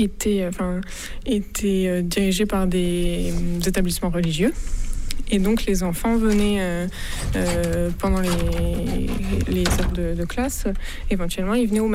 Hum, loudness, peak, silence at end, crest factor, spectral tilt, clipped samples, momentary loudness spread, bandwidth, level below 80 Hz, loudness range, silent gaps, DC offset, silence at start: none; -23 LUFS; -8 dBFS; 0 s; 12 dB; -5.5 dB/octave; under 0.1%; 7 LU; 16 kHz; -28 dBFS; 2 LU; none; under 0.1%; 0 s